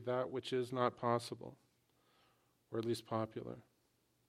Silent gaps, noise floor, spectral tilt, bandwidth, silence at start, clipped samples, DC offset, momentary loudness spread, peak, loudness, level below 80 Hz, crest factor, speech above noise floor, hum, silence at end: none; -78 dBFS; -6 dB/octave; 14.5 kHz; 0 s; under 0.1%; under 0.1%; 15 LU; -20 dBFS; -40 LUFS; -82 dBFS; 22 dB; 38 dB; none; 0.65 s